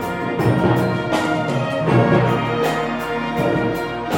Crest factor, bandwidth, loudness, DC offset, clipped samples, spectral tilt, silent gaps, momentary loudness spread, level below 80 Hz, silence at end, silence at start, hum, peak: 16 dB; 17 kHz; -19 LUFS; under 0.1%; under 0.1%; -7 dB/octave; none; 7 LU; -44 dBFS; 0 s; 0 s; none; -4 dBFS